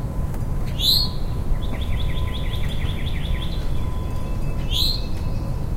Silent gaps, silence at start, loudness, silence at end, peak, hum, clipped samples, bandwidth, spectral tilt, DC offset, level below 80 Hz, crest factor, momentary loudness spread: none; 0 s; -24 LUFS; 0 s; -6 dBFS; none; under 0.1%; 16 kHz; -5 dB/octave; under 0.1%; -24 dBFS; 16 dB; 9 LU